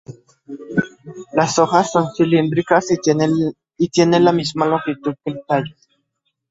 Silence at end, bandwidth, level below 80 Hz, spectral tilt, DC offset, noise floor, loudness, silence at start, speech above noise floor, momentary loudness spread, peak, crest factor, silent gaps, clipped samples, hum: 0.8 s; 8 kHz; -58 dBFS; -5.5 dB/octave; under 0.1%; -72 dBFS; -17 LUFS; 0.1 s; 55 dB; 12 LU; 0 dBFS; 18 dB; none; under 0.1%; none